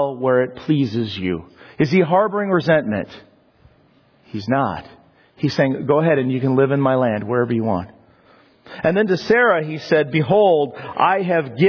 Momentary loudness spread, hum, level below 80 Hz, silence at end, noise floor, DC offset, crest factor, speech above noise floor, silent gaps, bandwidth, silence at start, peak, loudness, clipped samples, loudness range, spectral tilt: 10 LU; none; -56 dBFS; 0 s; -55 dBFS; under 0.1%; 16 dB; 37 dB; none; 5.4 kHz; 0 s; -4 dBFS; -18 LUFS; under 0.1%; 5 LU; -8 dB/octave